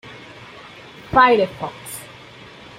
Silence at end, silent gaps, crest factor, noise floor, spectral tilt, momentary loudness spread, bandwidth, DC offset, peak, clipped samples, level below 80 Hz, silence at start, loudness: 0.75 s; none; 20 dB; -41 dBFS; -4.5 dB/octave; 26 LU; 16 kHz; under 0.1%; -2 dBFS; under 0.1%; -50 dBFS; 0.05 s; -17 LUFS